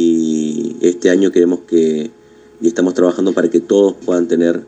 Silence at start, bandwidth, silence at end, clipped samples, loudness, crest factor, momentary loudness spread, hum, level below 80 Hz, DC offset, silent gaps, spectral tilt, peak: 0 s; 8.6 kHz; 0.05 s; under 0.1%; -14 LUFS; 14 dB; 6 LU; none; -64 dBFS; under 0.1%; none; -5.5 dB/octave; 0 dBFS